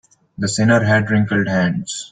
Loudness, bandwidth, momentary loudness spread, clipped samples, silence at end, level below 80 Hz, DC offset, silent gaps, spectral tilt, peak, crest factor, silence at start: -17 LUFS; 9.4 kHz; 9 LU; under 0.1%; 0.05 s; -52 dBFS; under 0.1%; none; -5.5 dB/octave; -2 dBFS; 14 dB; 0.4 s